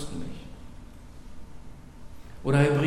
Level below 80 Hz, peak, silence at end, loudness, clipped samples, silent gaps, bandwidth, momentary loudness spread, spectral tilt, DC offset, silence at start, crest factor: -46 dBFS; -8 dBFS; 0 s; -27 LUFS; under 0.1%; none; 11 kHz; 25 LU; -7 dB/octave; under 0.1%; 0 s; 20 dB